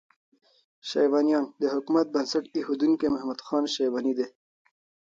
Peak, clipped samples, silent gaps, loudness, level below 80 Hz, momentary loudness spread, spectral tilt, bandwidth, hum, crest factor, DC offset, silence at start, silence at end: -12 dBFS; under 0.1%; none; -26 LUFS; -68 dBFS; 8 LU; -4.5 dB/octave; 7.6 kHz; none; 16 dB; under 0.1%; 0.85 s; 0.85 s